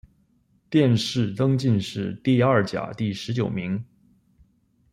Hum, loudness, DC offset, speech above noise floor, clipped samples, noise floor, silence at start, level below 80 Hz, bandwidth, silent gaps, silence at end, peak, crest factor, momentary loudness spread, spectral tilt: none; -23 LUFS; under 0.1%; 42 dB; under 0.1%; -64 dBFS; 0.7 s; -58 dBFS; 12 kHz; none; 1.1 s; -6 dBFS; 18 dB; 9 LU; -7 dB/octave